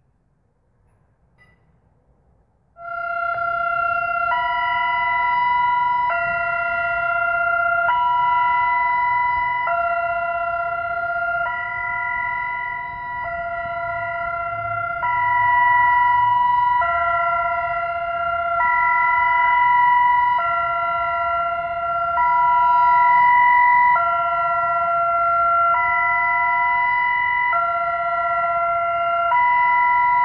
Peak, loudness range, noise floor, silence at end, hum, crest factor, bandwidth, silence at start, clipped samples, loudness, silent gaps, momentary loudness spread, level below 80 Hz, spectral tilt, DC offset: -6 dBFS; 8 LU; -64 dBFS; 0 s; none; 12 dB; 5.2 kHz; 2.8 s; under 0.1%; -18 LUFS; none; 9 LU; -50 dBFS; -6.5 dB/octave; under 0.1%